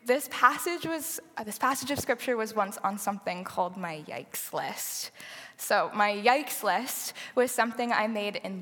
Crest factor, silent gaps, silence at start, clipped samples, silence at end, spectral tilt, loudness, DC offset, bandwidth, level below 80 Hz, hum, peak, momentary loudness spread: 24 dB; none; 0.05 s; under 0.1%; 0 s; -2.5 dB/octave; -29 LUFS; under 0.1%; 17.5 kHz; -76 dBFS; none; -6 dBFS; 12 LU